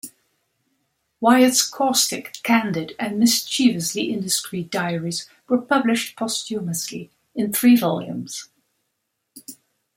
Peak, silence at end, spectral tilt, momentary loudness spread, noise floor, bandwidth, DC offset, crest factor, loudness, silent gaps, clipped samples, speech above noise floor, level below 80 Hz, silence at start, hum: -2 dBFS; 0.45 s; -3.5 dB/octave; 17 LU; -76 dBFS; 16.5 kHz; under 0.1%; 20 dB; -20 LUFS; none; under 0.1%; 55 dB; -68 dBFS; 0.05 s; none